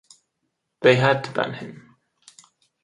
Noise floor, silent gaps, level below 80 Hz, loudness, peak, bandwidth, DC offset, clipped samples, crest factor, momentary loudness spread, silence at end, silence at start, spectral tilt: -77 dBFS; none; -64 dBFS; -20 LUFS; 0 dBFS; 11 kHz; under 0.1%; under 0.1%; 24 dB; 19 LU; 1.1 s; 0.8 s; -6 dB/octave